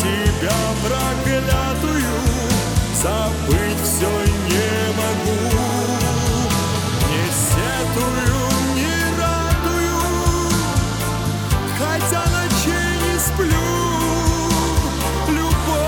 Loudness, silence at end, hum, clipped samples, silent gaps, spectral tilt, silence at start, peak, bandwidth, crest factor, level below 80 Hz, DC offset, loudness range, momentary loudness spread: -19 LUFS; 0 s; none; under 0.1%; none; -4.5 dB/octave; 0 s; -4 dBFS; over 20 kHz; 16 dB; -26 dBFS; under 0.1%; 1 LU; 2 LU